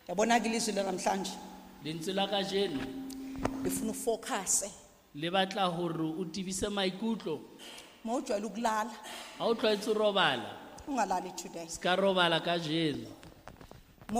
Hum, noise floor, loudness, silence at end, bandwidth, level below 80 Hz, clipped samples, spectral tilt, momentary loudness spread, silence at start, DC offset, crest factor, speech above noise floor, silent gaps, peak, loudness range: none; -54 dBFS; -32 LUFS; 0 s; 15.5 kHz; -60 dBFS; under 0.1%; -3.5 dB/octave; 16 LU; 0.1 s; under 0.1%; 20 dB; 21 dB; none; -12 dBFS; 4 LU